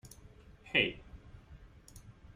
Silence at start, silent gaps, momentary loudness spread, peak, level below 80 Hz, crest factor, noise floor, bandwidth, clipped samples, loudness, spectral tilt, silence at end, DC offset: 0.05 s; none; 26 LU; -14 dBFS; -58 dBFS; 28 dB; -57 dBFS; 16 kHz; under 0.1%; -32 LUFS; -4 dB/octave; 0.05 s; under 0.1%